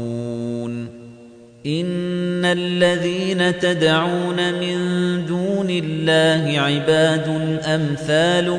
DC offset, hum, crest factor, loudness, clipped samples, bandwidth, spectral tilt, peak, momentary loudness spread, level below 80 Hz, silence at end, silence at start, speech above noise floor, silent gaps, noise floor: under 0.1%; none; 16 dB; -19 LUFS; under 0.1%; 10 kHz; -5.5 dB/octave; -4 dBFS; 10 LU; -56 dBFS; 0 s; 0 s; 25 dB; none; -43 dBFS